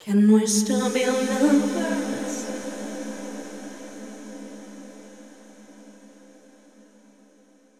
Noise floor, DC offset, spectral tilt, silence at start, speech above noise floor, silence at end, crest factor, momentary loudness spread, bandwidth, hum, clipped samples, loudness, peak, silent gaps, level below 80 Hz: -57 dBFS; 0.2%; -4.5 dB/octave; 0 s; 36 dB; 1.75 s; 18 dB; 23 LU; 15 kHz; none; under 0.1%; -23 LUFS; -8 dBFS; none; -82 dBFS